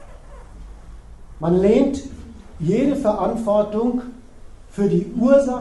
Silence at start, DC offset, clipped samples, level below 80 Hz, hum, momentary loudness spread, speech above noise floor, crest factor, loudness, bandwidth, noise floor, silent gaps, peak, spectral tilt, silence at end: 0 s; under 0.1%; under 0.1%; -40 dBFS; none; 17 LU; 22 dB; 16 dB; -19 LUFS; 11.5 kHz; -40 dBFS; none; -4 dBFS; -8 dB/octave; 0 s